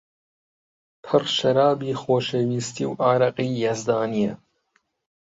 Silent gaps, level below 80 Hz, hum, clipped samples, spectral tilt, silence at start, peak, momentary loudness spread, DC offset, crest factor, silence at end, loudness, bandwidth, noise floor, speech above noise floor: none; -64 dBFS; none; under 0.1%; -5.5 dB/octave; 1.05 s; -4 dBFS; 7 LU; under 0.1%; 18 dB; 0.85 s; -22 LUFS; 8 kHz; -69 dBFS; 47 dB